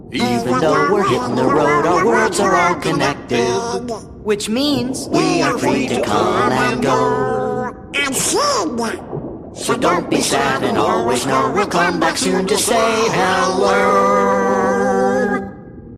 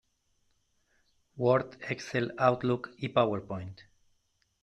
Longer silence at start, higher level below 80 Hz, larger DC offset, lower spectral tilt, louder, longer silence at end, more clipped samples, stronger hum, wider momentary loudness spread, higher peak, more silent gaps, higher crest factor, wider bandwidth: second, 0 s vs 1.35 s; first, -44 dBFS vs -66 dBFS; neither; second, -4 dB/octave vs -6.5 dB/octave; first, -16 LUFS vs -30 LUFS; second, 0 s vs 0.8 s; neither; neither; second, 8 LU vs 12 LU; first, 0 dBFS vs -10 dBFS; neither; second, 16 dB vs 22 dB; first, 15.5 kHz vs 9.2 kHz